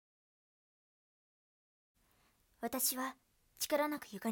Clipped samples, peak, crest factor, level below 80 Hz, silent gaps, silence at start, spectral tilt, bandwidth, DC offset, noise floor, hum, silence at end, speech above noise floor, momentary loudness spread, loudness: under 0.1%; -20 dBFS; 24 dB; -78 dBFS; none; 2.6 s; -2 dB/octave; 17.5 kHz; under 0.1%; -73 dBFS; none; 0 s; 36 dB; 9 LU; -37 LUFS